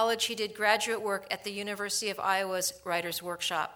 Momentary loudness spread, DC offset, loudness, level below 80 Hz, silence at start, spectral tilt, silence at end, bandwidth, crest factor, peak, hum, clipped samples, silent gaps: 8 LU; under 0.1%; -30 LUFS; -72 dBFS; 0 s; -1.5 dB/octave; 0 s; over 20 kHz; 22 dB; -8 dBFS; none; under 0.1%; none